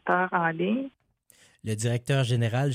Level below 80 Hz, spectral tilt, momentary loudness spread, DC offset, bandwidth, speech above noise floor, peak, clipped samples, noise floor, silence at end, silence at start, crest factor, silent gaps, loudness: -66 dBFS; -6 dB/octave; 11 LU; under 0.1%; 14 kHz; 36 dB; -10 dBFS; under 0.1%; -61 dBFS; 0 s; 0.05 s; 18 dB; none; -27 LUFS